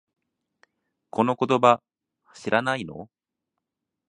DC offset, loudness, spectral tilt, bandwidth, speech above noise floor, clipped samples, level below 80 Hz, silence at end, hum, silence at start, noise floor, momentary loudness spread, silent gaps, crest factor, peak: under 0.1%; -23 LUFS; -5.5 dB/octave; 10 kHz; 62 dB; under 0.1%; -66 dBFS; 1.05 s; none; 1.15 s; -84 dBFS; 18 LU; none; 24 dB; -2 dBFS